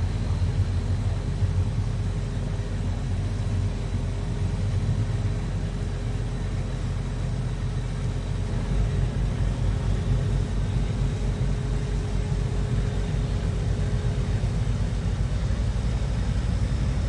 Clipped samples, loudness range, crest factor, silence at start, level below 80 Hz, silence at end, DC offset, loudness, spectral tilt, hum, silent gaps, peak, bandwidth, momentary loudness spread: under 0.1%; 2 LU; 12 dB; 0 s; -28 dBFS; 0 s; under 0.1%; -27 LUFS; -7 dB/octave; none; none; -12 dBFS; 10.5 kHz; 4 LU